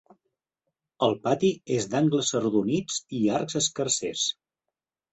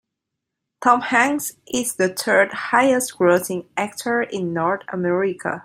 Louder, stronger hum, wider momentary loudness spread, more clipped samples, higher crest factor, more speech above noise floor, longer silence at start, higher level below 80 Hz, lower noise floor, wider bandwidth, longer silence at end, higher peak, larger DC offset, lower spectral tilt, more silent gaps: second, -26 LUFS vs -20 LUFS; neither; second, 4 LU vs 8 LU; neither; about the same, 18 dB vs 18 dB; about the same, 62 dB vs 62 dB; first, 1 s vs 0.8 s; about the same, -64 dBFS vs -64 dBFS; first, -87 dBFS vs -81 dBFS; second, 8.2 kHz vs 16 kHz; first, 0.8 s vs 0 s; second, -8 dBFS vs -2 dBFS; neither; about the same, -4 dB/octave vs -4 dB/octave; neither